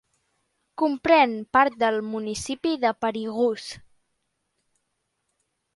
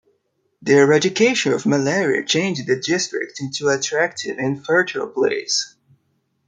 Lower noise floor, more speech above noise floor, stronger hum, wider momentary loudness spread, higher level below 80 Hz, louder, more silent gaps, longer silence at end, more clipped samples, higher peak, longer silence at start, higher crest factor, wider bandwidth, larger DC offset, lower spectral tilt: first, -77 dBFS vs -68 dBFS; first, 54 dB vs 49 dB; neither; first, 14 LU vs 9 LU; first, -60 dBFS vs -66 dBFS; second, -23 LUFS vs -19 LUFS; neither; first, 1.95 s vs 0.8 s; neither; second, -6 dBFS vs -2 dBFS; first, 0.8 s vs 0.6 s; about the same, 20 dB vs 18 dB; first, 11.5 kHz vs 9.4 kHz; neither; about the same, -4 dB/octave vs -3.5 dB/octave